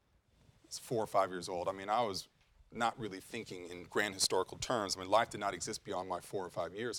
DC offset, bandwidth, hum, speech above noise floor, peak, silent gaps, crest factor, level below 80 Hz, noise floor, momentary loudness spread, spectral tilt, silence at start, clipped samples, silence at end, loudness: under 0.1%; 18 kHz; none; 32 dB; -16 dBFS; none; 22 dB; -68 dBFS; -68 dBFS; 13 LU; -3 dB/octave; 0.7 s; under 0.1%; 0 s; -37 LUFS